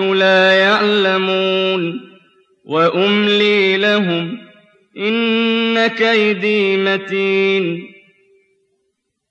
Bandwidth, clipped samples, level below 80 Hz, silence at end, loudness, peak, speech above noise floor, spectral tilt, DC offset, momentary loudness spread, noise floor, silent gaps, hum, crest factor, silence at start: 8 kHz; under 0.1%; -72 dBFS; 1.4 s; -14 LUFS; -2 dBFS; 56 dB; -5.5 dB/octave; under 0.1%; 10 LU; -70 dBFS; none; none; 12 dB; 0 s